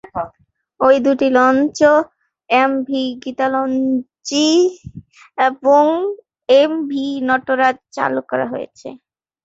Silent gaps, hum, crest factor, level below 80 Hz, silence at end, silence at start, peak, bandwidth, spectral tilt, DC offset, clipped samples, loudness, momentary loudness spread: none; none; 16 dB; -56 dBFS; 0.5 s; 0.15 s; -2 dBFS; 8 kHz; -4 dB/octave; under 0.1%; under 0.1%; -16 LUFS; 15 LU